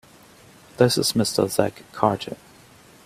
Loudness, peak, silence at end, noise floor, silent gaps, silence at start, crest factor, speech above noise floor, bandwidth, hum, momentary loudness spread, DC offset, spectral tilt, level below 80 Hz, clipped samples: -22 LUFS; -2 dBFS; 0.7 s; -50 dBFS; none; 0.8 s; 22 dB; 28 dB; 16 kHz; none; 12 LU; under 0.1%; -4.5 dB/octave; -58 dBFS; under 0.1%